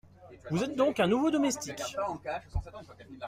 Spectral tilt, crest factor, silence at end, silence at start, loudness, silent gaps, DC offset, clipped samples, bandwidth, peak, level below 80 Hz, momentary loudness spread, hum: -5 dB/octave; 18 dB; 0 s; 0.2 s; -31 LUFS; none; under 0.1%; under 0.1%; 15.5 kHz; -14 dBFS; -48 dBFS; 22 LU; none